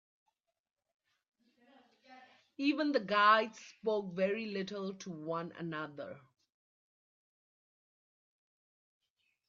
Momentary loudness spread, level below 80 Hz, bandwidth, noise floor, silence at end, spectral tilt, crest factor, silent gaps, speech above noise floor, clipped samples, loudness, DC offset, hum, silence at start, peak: 16 LU; -86 dBFS; 7.4 kHz; -90 dBFS; 3.3 s; -3 dB/octave; 26 dB; none; 56 dB; under 0.1%; -34 LUFS; under 0.1%; none; 2.1 s; -14 dBFS